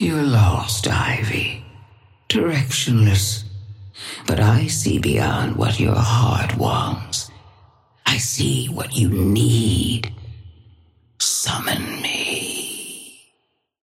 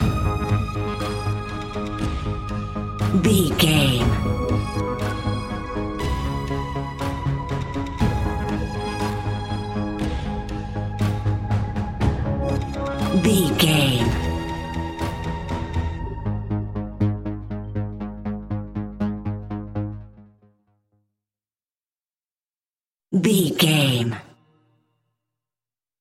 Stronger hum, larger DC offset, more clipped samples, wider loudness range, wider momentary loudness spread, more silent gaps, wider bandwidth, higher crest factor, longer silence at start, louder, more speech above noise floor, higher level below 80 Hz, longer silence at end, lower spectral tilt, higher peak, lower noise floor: neither; neither; neither; second, 4 LU vs 10 LU; about the same, 14 LU vs 12 LU; second, none vs 22.31-22.35 s, 22.68-22.74 s; about the same, 16 kHz vs 16.5 kHz; about the same, 18 dB vs 20 dB; about the same, 0 s vs 0 s; first, -19 LUFS vs -24 LUFS; second, 51 dB vs over 72 dB; second, -40 dBFS vs -34 dBFS; second, 0.75 s vs 1.75 s; about the same, -4.5 dB/octave vs -5.5 dB/octave; about the same, -2 dBFS vs -4 dBFS; second, -70 dBFS vs under -90 dBFS